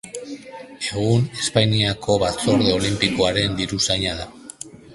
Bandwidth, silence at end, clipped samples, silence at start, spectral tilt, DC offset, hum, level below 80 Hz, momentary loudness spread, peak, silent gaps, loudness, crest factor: 11.5 kHz; 0 s; under 0.1%; 0.05 s; -4.5 dB/octave; under 0.1%; none; -44 dBFS; 18 LU; 0 dBFS; none; -20 LUFS; 22 dB